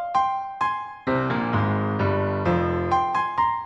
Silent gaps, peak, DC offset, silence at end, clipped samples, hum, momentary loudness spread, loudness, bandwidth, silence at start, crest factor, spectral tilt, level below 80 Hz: none; -10 dBFS; under 0.1%; 0 s; under 0.1%; none; 4 LU; -24 LUFS; 8 kHz; 0 s; 14 dB; -8 dB/octave; -48 dBFS